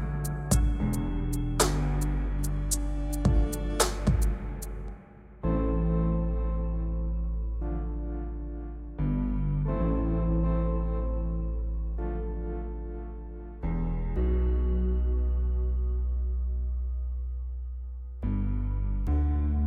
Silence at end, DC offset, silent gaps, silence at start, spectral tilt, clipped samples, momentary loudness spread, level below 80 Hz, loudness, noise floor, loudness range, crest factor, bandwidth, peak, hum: 0 s; under 0.1%; none; 0 s; -6 dB/octave; under 0.1%; 11 LU; -30 dBFS; -30 LUFS; -48 dBFS; 4 LU; 20 dB; 15 kHz; -8 dBFS; none